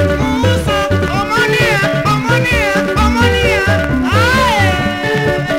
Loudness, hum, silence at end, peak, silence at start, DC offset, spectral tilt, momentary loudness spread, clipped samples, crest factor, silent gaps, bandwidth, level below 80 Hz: -12 LUFS; none; 0 s; 0 dBFS; 0 s; under 0.1%; -5.5 dB/octave; 4 LU; under 0.1%; 12 dB; none; 16.5 kHz; -26 dBFS